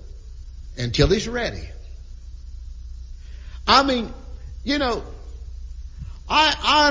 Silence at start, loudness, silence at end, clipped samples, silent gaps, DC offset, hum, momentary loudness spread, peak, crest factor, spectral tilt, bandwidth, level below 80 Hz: 0 s; -20 LUFS; 0 s; under 0.1%; none; under 0.1%; none; 25 LU; -2 dBFS; 22 dB; -4 dB/octave; 7.6 kHz; -34 dBFS